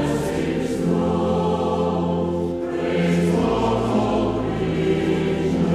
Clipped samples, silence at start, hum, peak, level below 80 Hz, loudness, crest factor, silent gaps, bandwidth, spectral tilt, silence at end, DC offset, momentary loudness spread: under 0.1%; 0 s; none; -8 dBFS; -40 dBFS; -21 LUFS; 14 dB; none; 12.5 kHz; -7 dB/octave; 0 s; under 0.1%; 4 LU